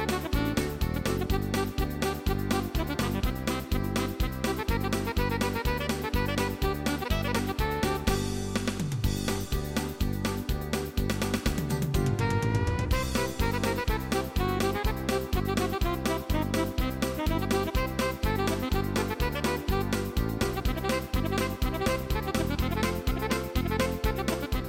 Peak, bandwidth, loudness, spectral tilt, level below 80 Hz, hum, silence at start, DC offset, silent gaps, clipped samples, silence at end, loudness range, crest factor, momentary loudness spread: -12 dBFS; 17 kHz; -29 LUFS; -5.5 dB/octave; -34 dBFS; none; 0 s; under 0.1%; none; under 0.1%; 0 s; 1 LU; 16 dB; 3 LU